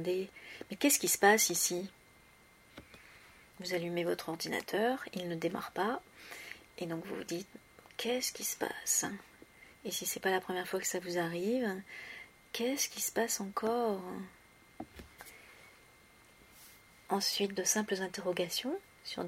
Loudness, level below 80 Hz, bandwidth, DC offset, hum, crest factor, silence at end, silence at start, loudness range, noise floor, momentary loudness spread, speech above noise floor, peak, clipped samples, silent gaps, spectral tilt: -34 LUFS; -72 dBFS; 16 kHz; under 0.1%; none; 26 dB; 0 s; 0 s; 8 LU; -62 dBFS; 21 LU; 27 dB; -12 dBFS; under 0.1%; none; -2.5 dB/octave